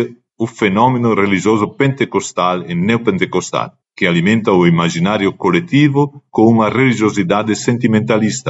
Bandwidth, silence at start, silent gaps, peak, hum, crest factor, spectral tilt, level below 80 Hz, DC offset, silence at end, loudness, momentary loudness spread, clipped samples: 8 kHz; 0 s; none; 0 dBFS; none; 14 dB; -6 dB/octave; -54 dBFS; under 0.1%; 0 s; -14 LUFS; 6 LU; under 0.1%